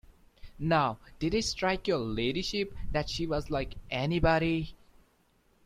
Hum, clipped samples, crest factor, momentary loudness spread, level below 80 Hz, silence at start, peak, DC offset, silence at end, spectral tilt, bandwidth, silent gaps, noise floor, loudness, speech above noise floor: none; under 0.1%; 18 dB; 8 LU; -44 dBFS; 0.45 s; -12 dBFS; under 0.1%; 0.9 s; -5 dB/octave; 14 kHz; none; -68 dBFS; -31 LUFS; 38 dB